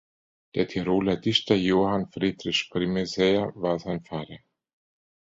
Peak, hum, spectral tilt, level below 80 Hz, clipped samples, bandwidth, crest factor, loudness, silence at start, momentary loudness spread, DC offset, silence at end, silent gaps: -6 dBFS; none; -5.5 dB/octave; -56 dBFS; under 0.1%; 7.8 kHz; 20 dB; -25 LUFS; 0.55 s; 10 LU; under 0.1%; 0.85 s; none